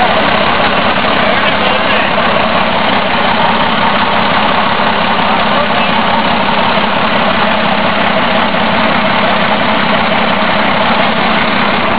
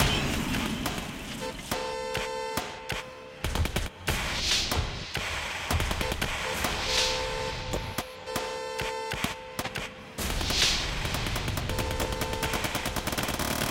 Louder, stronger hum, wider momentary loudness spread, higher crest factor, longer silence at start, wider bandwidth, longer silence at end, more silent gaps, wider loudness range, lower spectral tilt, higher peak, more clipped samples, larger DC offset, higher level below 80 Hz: first, -10 LUFS vs -30 LUFS; neither; second, 1 LU vs 10 LU; second, 10 dB vs 20 dB; about the same, 0 s vs 0 s; second, 4 kHz vs 17 kHz; about the same, 0 s vs 0 s; neither; second, 0 LU vs 4 LU; first, -8 dB/octave vs -3 dB/octave; first, 0 dBFS vs -12 dBFS; neither; first, 10% vs under 0.1%; about the same, -36 dBFS vs -38 dBFS